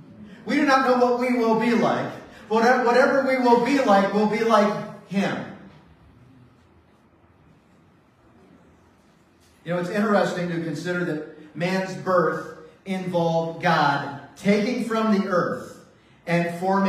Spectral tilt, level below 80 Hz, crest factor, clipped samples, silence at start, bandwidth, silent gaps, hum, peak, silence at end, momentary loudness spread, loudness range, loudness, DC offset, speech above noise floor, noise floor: -6 dB/octave; -66 dBFS; 18 dB; under 0.1%; 0.1 s; 14.5 kHz; none; none; -4 dBFS; 0 s; 14 LU; 9 LU; -22 LUFS; under 0.1%; 36 dB; -57 dBFS